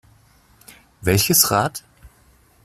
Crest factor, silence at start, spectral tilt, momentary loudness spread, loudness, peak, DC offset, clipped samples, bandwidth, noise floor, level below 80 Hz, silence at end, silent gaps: 22 dB; 1 s; -3 dB/octave; 12 LU; -17 LUFS; 0 dBFS; under 0.1%; under 0.1%; 16 kHz; -55 dBFS; -48 dBFS; 0.55 s; none